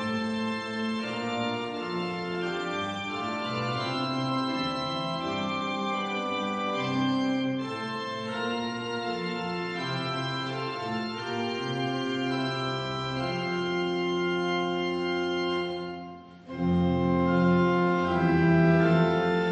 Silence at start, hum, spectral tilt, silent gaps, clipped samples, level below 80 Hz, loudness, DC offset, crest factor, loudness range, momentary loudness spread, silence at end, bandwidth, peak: 0 s; none; -6.5 dB/octave; none; under 0.1%; -62 dBFS; -28 LUFS; under 0.1%; 16 dB; 6 LU; 9 LU; 0 s; 9 kHz; -12 dBFS